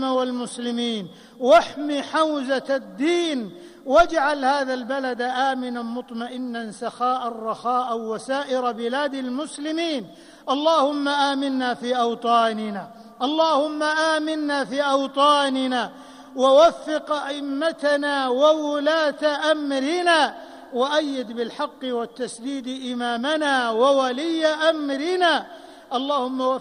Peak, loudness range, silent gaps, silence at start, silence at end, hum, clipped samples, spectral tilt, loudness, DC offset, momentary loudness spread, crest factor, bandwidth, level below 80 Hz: -6 dBFS; 5 LU; none; 0 s; 0 s; none; under 0.1%; -3 dB/octave; -22 LUFS; under 0.1%; 12 LU; 16 dB; 11.5 kHz; -56 dBFS